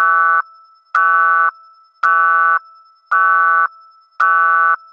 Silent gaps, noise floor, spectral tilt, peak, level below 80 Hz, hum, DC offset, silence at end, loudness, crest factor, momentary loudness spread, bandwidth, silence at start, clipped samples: none; -46 dBFS; 3.5 dB/octave; -2 dBFS; under -90 dBFS; none; under 0.1%; 0.15 s; -13 LUFS; 14 dB; 7 LU; 7 kHz; 0 s; under 0.1%